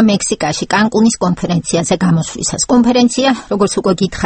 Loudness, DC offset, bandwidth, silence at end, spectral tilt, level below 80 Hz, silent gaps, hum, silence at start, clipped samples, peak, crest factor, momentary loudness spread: -13 LUFS; under 0.1%; 9 kHz; 0 s; -4.5 dB/octave; -40 dBFS; none; none; 0 s; under 0.1%; 0 dBFS; 12 dB; 5 LU